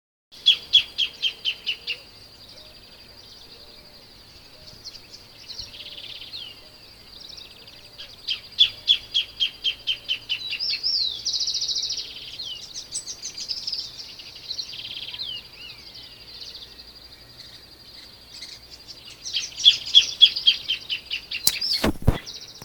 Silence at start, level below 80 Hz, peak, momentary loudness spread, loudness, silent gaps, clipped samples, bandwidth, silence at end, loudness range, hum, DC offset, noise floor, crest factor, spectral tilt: 0.3 s; -44 dBFS; 0 dBFS; 26 LU; -22 LUFS; none; under 0.1%; over 20 kHz; 0 s; 21 LU; none; under 0.1%; -48 dBFS; 28 dB; -1.5 dB/octave